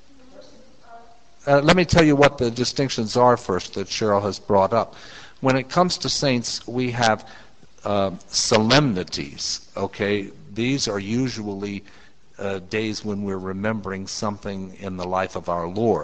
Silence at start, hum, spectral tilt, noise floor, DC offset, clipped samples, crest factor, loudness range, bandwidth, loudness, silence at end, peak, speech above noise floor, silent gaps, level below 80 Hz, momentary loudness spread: 0.4 s; none; -4.5 dB/octave; -50 dBFS; 0.6%; under 0.1%; 22 dB; 8 LU; 9.2 kHz; -22 LUFS; 0 s; 0 dBFS; 28 dB; none; -46 dBFS; 14 LU